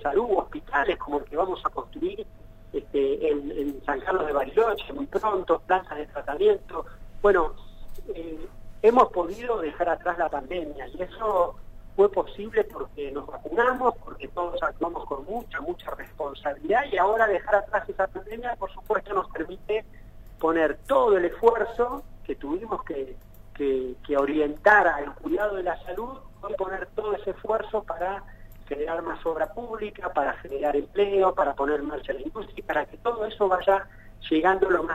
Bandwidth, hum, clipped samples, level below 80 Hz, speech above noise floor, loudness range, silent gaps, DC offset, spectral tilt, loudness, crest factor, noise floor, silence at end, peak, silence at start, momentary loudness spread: 15 kHz; none; under 0.1%; -44 dBFS; 21 dB; 5 LU; none; under 0.1%; -6 dB/octave; -26 LUFS; 24 dB; -46 dBFS; 0 s; -2 dBFS; 0 s; 14 LU